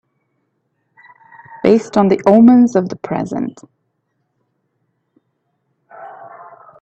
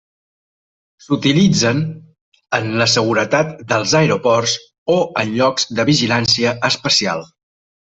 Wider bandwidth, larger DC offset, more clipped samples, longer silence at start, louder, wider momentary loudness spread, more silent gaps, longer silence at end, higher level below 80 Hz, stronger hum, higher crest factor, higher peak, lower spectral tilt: about the same, 8 kHz vs 8.4 kHz; neither; neither; first, 1.65 s vs 1.1 s; first, -13 LUFS vs -16 LUFS; first, 28 LU vs 8 LU; second, none vs 2.21-2.32 s, 4.78-4.86 s; second, 0.55 s vs 0.7 s; second, -58 dBFS vs -52 dBFS; neither; about the same, 18 dB vs 16 dB; about the same, 0 dBFS vs -2 dBFS; first, -7.5 dB/octave vs -4 dB/octave